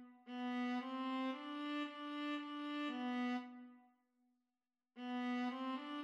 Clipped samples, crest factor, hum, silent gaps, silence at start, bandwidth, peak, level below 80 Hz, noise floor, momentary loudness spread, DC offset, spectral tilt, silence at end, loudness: under 0.1%; 12 dB; none; none; 0 s; 8 kHz; -32 dBFS; under -90 dBFS; under -90 dBFS; 8 LU; under 0.1%; -4 dB/octave; 0 s; -44 LUFS